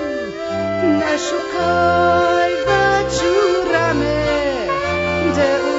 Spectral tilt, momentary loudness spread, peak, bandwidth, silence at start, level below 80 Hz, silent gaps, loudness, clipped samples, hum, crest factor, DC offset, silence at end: -5 dB/octave; 6 LU; -2 dBFS; 8 kHz; 0 s; -38 dBFS; none; -17 LUFS; under 0.1%; none; 14 dB; under 0.1%; 0 s